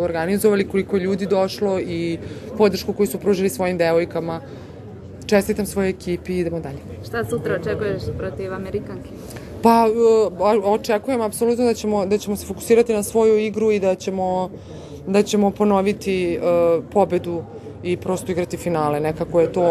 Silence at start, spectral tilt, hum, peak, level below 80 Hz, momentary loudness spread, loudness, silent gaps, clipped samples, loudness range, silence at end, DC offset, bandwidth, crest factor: 0 s; -6 dB/octave; none; 0 dBFS; -46 dBFS; 14 LU; -20 LUFS; none; under 0.1%; 6 LU; 0 s; under 0.1%; 13 kHz; 20 dB